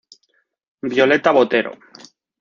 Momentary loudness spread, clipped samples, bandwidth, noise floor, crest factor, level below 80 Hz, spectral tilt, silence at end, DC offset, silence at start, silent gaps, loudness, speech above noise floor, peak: 15 LU; under 0.1%; 7.4 kHz; -66 dBFS; 18 dB; -64 dBFS; -5 dB/octave; 0.7 s; under 0.1%; 0.85 s; none; -16 LUFS; 50 dB; -2 dBFS